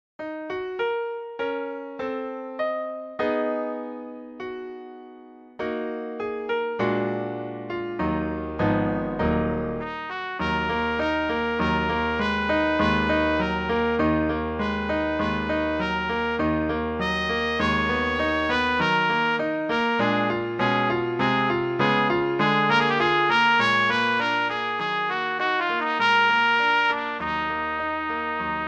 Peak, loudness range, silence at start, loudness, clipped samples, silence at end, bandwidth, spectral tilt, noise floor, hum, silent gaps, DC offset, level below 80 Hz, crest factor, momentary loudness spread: -8 dBFS; 9 LU; 0.2 s; -24 LUFS; under 0.1%; 0 s; 8.8 kHz; -6 dB/octave; -46 dBFS; none; none; under 0.1%; -44 dBFS; 16 dB; 12 LU